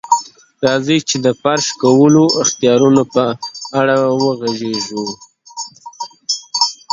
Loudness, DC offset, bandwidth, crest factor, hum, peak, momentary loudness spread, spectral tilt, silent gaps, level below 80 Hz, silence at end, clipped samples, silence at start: -14 LUFS; under 0.1%; 7.8 kHz; 14 dB; none; 0 dBFS; 17 LU; -4 dB/octave; none; -58 dBFS; 0.2 s; under 0.1%; 0.05 s